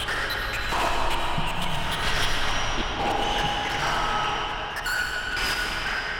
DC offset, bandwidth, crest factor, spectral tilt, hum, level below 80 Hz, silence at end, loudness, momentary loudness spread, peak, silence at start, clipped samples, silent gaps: under 0.1%; 17.5 kHz; 14 dB; -3 dB/octave; none; -34 dBFS; 0 s; -26 LUFS; 3 LU; -12 dBFS; 0 s; under 0.1%; none